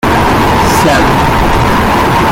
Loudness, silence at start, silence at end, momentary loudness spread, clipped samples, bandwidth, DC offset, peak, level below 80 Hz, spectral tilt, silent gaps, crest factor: -8 LUFS; 0.05 s; 0 s; 2 LU; under 0.1%; 17 kHz; under 0.1%; 0 dBFS; -20 dBFS; -5 dB/octave; none; 8 dB